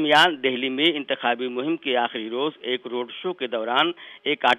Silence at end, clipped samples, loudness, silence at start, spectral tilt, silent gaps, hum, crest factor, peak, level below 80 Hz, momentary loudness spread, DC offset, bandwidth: 0 s; under 0.1%; -23 LUFS; 0 s; -4 dB/octave; none; none; 18 dB; -6 dBFS; -72 dBFS; 9 LU; under 0.1%; 15 kHz